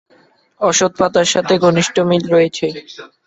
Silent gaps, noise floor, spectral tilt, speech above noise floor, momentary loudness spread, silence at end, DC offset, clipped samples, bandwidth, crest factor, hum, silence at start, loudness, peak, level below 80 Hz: none; -53 dBFS; -4 dB/octave; 38 dB; 9 LU; 0.2 s; under 0.1%; under 0.1%; 8.4 kHz; 14 dB; none; 0.6 s; -14 LUFS; -2 dBFS; -54 dBFS